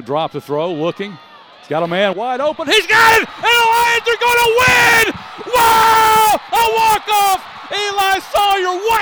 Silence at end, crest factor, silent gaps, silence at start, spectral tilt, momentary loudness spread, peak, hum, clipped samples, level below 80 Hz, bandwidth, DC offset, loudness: 0 s; 14 dB; none; 0 s; -2 dB/octave; 12 LU; 0 dBFS; none; under 0.1%; -46 dBFS; over 20 kHz; under 0.1%; -13 LUFS